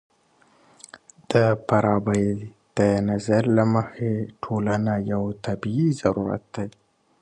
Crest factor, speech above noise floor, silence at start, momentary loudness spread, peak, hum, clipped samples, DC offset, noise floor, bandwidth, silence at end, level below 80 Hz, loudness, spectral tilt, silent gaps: 18 dB; 38 dB; 0.95 s; 9 LU; -4 dBFS; none; under 0.1%; under 0.1%; -60 dBFS; 10.5 kHz; 0.5 s; -52 dBFS; -23 LUFS; -7.5 dB/octave; none